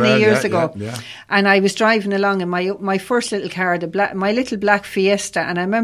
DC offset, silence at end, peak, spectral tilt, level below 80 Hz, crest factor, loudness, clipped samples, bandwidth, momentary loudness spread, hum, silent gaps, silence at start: under 0.1%; 0 s; 0 dBFS; -5 dB/octave; -56 dBFS; 18 dB; -18 LUFS; under 0.1%; 15 kHz; 7 LU; none; none; 0 s